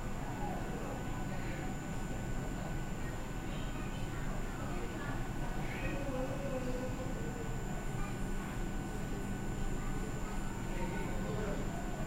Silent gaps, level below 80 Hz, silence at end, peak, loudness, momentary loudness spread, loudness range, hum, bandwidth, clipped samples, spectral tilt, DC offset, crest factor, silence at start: none; -42 dBFS; 0 s; -24 dBFS; -41 LUFS; 3 LU; 1 LU; none; 16 kHz; under 0.1%; -6 dB/octave; 0.2%; 12 dB; 0 s